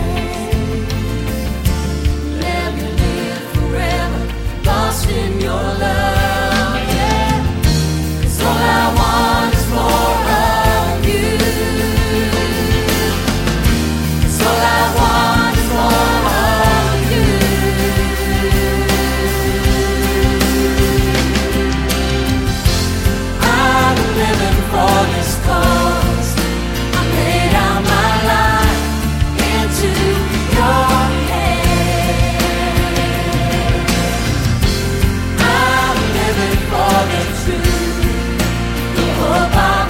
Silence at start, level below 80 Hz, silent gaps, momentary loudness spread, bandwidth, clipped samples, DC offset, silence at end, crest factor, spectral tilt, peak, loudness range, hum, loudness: 0 s; -20 dBFS; none; 5 LU; 17 kHz; under 0.1%; under 0.1%; 0 s; 14 dB; -5 dB/octave; 0 dBFS; 3 LU; none; -15 LUFS